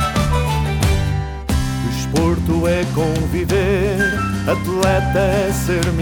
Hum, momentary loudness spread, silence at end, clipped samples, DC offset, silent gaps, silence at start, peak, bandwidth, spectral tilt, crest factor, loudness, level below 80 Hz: none; 4 LU; 0 s; under 0.1%; under 0.1%; none; 0 s; -2 dBFS; 19.5 kHz; -6 dB/octave; 16 dB; -18 LUFS; -26 dBFS